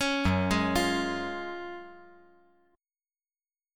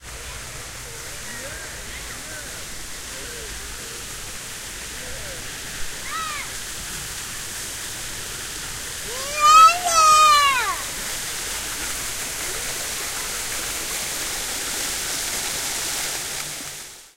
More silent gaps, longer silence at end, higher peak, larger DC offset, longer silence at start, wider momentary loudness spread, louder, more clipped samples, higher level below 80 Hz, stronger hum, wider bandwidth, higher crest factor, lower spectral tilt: neither; first, 1.7 s vs 0.1 s; second, -12 dBFS vs -2 dBFS; neither; about the same, 0 s vs 0 s; about the same, 16 LU vs 18 LU; second, -29 LUFS vs -22 LUFS; neither; second, -50 dBFS vs -44 dBFS; neither; about the same, 17.5 kHz vs 16 kHz; about the same, 20 dB vs 22 dB; first, -5 dB/octave vs 0 dB/octave